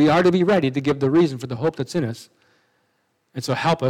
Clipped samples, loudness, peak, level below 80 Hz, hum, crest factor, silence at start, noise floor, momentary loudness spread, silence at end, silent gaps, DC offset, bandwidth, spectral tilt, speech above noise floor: under 0.1%; -21 LUFS; -6 dBFS; -60 dBFS; none; 16 dB; 0 s; -68 dBFS; 13 LU; 0 s; none; under 0.1%; 14.5 kHz; -6.5 dB/octave; 49 dB